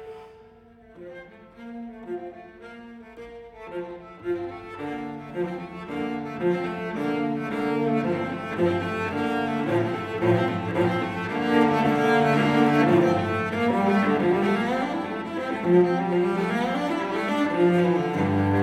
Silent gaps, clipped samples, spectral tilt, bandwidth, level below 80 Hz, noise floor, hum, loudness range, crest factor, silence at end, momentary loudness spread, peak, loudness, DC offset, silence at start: none; under 0.1%; -7.5 dB/octave; 12.5 kHz; -60 dBFS; -51 dBFS; none; 15 LU; 16 dB; 0 s; 21 LU; -8 dBFS; -24 LUFS; under 0.1%; 0 s